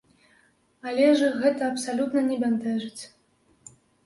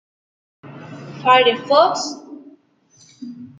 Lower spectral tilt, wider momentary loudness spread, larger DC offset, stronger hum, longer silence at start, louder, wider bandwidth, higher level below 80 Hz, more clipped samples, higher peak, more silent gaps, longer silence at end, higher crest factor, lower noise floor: first, -4.5 dB/octave vs -3 dB/octave; second, 18 LU vs 24 LU; neither; neither; first, 0.85 s vs 0.65 s; second, -24 LUFS vs -16 LUFS; first, 11.5 kHz vs 9.2 kHz; about the same, -72 dBFS vs -72 dBFS; neither; second, -8 dBFS vs 0 dBFS; neither; first, 1 s vs 0.15 s; about the same, 18 dB vs 20 dB; first, -64 dBFS vs -54 dBFS